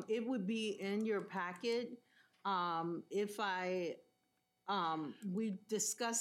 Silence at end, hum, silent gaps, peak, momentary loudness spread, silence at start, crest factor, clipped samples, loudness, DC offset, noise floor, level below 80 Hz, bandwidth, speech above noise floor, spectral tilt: 0 s; none; none; -26 dBFS; 7 LU; 0 s; 16 dB; under 0.1%; -40 LUFS; under 0.1%; -82 dBFS; under -90 dBFS; 16 kHz; 43 dB; -3.5 dB/octave